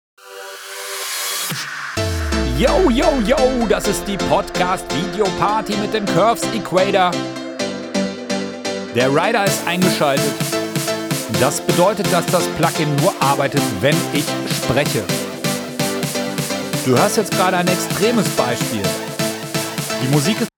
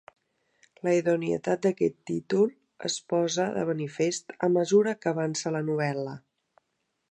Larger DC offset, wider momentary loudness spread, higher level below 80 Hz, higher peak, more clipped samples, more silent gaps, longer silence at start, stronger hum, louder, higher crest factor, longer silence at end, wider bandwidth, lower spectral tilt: neither; about the same, 7 LU vs 9 LU; first, -36 dBFS vs -72 dBFS; first, -2 dBFS vs -10 dBFS; neither; neither; second, 0.25 s vs 0.85 s; neither; first, -18 LUFS vs -27 LUFS; about the same, 16 dB vs 18 dB; second, 0.1 s vs 0.95 s; first, over 20 kHz vs 10.5 kHz; about the same, -4 dB/octave vs -5 dB/octave